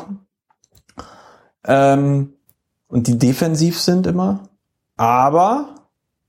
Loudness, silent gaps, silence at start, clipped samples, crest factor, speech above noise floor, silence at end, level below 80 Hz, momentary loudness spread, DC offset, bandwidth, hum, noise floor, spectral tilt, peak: -16 LUFS; none; 0 s; under 0.1%; 16 dB; 48 dB; 0.55 s; -52 dBFS; 17 LU; under 0.1%; 16.5 kHz; none; -63 dBFS; -6 dB/octave; -2 dBFS